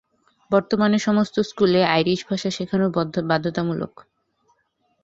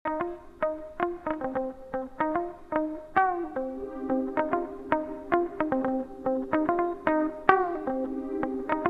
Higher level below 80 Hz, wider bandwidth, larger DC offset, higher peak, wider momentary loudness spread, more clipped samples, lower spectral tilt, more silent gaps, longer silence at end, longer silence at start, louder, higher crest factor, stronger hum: second, -60 dBFS vs -54 dBFS; first, 7.8 kHz vs 5.4 kHz; neither; second, -4 dBFS vs 0 dBFS; about the same, 7 LU vs 8 LU; neither; second, -6 dB/octave vs -8 dB/octave; neither; first, 1.15 s vs 0 s; first, 0.5 s vs 0.05 s; first, -21 LUFS vs -29 LUFS; second, 20 dB vs 28 dB; neither